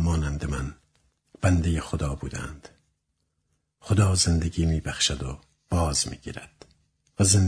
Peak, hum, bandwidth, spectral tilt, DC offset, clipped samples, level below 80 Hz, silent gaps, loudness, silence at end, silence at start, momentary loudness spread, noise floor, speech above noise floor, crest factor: -6 dBFS; none; 11 kHz; -4.5 dB/octave; under 0.1%; under 0.1%; -36 dBFS; none; -26 LUFS; 0 s; 0 s; 18 LU; -76 dBFS; 52 dB; 20 dB